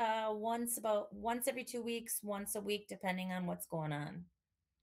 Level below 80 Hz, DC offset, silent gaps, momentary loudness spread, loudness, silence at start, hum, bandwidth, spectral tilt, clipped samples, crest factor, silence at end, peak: -74 dBFS; under 0.1%; none; 5 LU; -39 LUFS; 0 s; none; 16 kHz; -4 dB/octave; under 0.1%; 16 dB; 0.55 s; -24 dBFS